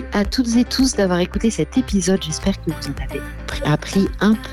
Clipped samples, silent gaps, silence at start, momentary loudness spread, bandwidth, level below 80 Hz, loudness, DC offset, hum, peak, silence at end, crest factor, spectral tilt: under 0.1%; none; 0 s; 10 LU; 14 kHz; -32 dBFS; -20 LUFS; under 0.1%; none; -6 dBFS; 0 s; 12 dB; -5 dB/octave